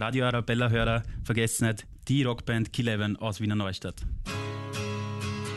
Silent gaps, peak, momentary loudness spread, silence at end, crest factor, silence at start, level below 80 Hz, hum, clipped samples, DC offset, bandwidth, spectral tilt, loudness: none; -12 dBFS; 9 LU; 0 s; 16 dB; 0 s; -42 dBFS; none; under 0.1%; under 0.1%; 12.5 kHz; -5 dB/octave; -29 LUFS